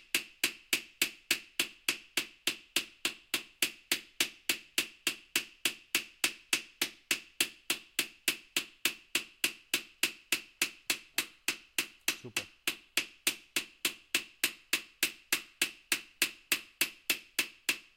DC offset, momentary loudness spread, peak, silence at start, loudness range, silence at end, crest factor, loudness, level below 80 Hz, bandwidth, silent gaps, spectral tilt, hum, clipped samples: under 0.1%; 5 LU; -10 dBFS; 0.15 s; 1 LU; 0.15 s; 26 dB; -33 LUFS; -76 dBFS; 17 kHz; none; 1 dB/octave; none; under 0.1%